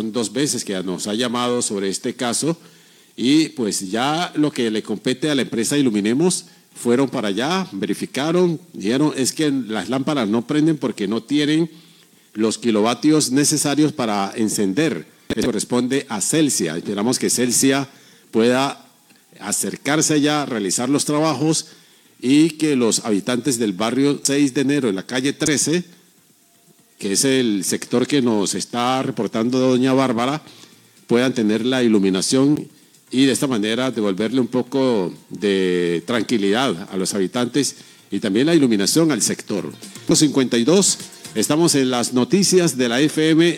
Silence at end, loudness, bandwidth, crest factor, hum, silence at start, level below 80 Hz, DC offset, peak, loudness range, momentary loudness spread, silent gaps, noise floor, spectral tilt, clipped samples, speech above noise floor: 0 s; -19 LUFS; 17 kHz; 18 dB; none; 0 s; -64 dBFS; under 0.1%; -2 dBFS; 3 LU; 8 LU; none; -55 dBFS; -4 dB/octave; under 0.1%; 36 dB